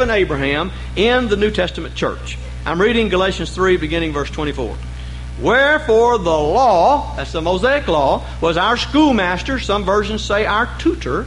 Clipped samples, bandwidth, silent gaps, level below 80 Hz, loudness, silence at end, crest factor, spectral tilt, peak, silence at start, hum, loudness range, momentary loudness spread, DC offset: under 0.1%; 11.5 kHz; none; -30 dBFS; -16 LUFS; 0 s; 14 dB; -5.5 dB/octave; -4 dBFS; 0 s; none; 4 LU; 10 LU; under 0.1%